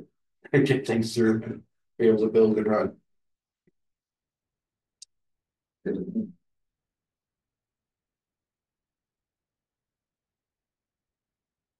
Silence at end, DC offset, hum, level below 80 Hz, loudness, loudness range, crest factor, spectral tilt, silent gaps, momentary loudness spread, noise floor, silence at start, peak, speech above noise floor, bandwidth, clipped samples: 5.5 s; under 0.1%; none; -70 dBFS; -25 LUFS; 16 LU; 22 dB; -7 dB/octave; none; 15 LU; under -90 dBFS; 0 s; -8 dBFS; over 67 dB; 12.5 kHz; under 0.1%